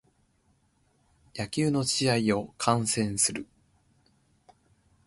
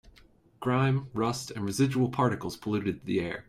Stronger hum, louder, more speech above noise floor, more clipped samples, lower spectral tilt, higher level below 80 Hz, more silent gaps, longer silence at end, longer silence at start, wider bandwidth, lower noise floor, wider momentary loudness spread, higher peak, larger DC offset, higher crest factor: neither; about the same, -27 LUFS vs -29 LUFS; first, 41 dB vs 31 dB; neither; second, -4 dB/octave vs -6.5 dB/octave; about the same, -60 dBFS vs -60 dBFS; neither; first, 1.65 s vs 0.05 s; first, 1.35 s vs 0.6 s; second, 12 kHz vs 15 kHz; first, -68 dBFS vs -59 dBFS; first, 14 LU vs 7 LU; first, -8 dBFS vs -14 dBFS; neither; first, 24 dB vs 16 dB